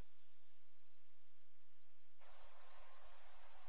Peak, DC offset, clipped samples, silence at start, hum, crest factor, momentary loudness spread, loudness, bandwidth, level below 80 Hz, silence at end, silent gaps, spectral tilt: -40 dBFS; 0.8%; under 0.1%; 0 s; 50 Hz at -95 dBFS; 18 dB; 1 LU; -67 LUFS; 4 kHz; -80 dBFS; 0 s; none; -3.5 dB/octave